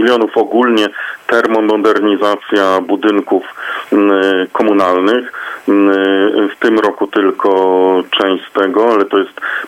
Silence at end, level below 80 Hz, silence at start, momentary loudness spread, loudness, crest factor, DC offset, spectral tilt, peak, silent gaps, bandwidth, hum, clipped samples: 0 s; -64 dBFS; 0 s; 6 LU; -12 LUFS; 12 dB; under 0.1%; -5 dB/octave; 0 dBFS; none; 14 kHz; none; under 0.1%